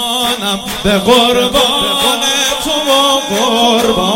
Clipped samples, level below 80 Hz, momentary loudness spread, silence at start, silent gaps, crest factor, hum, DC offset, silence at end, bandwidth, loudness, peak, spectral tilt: 0.3%; -36 dBFS; 5 LU; 0 s; none; 12 dB; none; under 0.1%; 0 s; 17 kHz; -11 LUFS; 0 dBFS; -2.5 dB/octave